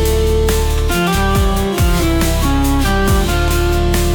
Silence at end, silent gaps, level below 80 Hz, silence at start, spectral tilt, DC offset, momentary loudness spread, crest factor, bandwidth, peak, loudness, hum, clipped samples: 0 s; none; -16 dBFS; 0 s; -5 dB/octave; under 0.1%; 1 LU; 8 dB; 19.5 kHz; -4 dBFS; -15 LUFS; none; under 0.1%